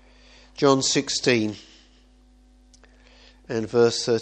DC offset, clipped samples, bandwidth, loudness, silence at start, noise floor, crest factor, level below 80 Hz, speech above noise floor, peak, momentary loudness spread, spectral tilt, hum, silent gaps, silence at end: under 0.1%; under 0.1%; 9.4 kHz; -22 LUFS; 0.6 s; -55 dBFS; 22 dB; -56 dBFS; 33 dB; -4 dBFS; 12 LU; -3.5 dB/octave; none; none; 0 s